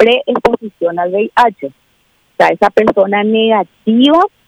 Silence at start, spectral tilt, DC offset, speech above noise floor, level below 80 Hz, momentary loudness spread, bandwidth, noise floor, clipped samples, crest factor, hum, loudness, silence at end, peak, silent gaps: 0 s; -6 dB/octave; under 0.1%; 45 dB; -48 dBFS; 8 LU; 11.5 kHz; -56 dBFS; under 0.1%; 12 dB; none; -12 LUFS; 0.2 s; 0 dBFS; none